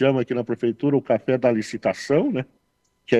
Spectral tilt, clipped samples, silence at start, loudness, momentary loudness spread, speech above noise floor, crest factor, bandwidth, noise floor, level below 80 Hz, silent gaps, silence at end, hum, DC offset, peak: -7 dB/octave; under 0.1%; 0 s; -22 LUFS; 5 LU; 47 dB; 18 dB; 11.5 kHz; -69 dBFS; -62 dBFS; none; 0 s; none; under 0.1%; -4 dBFS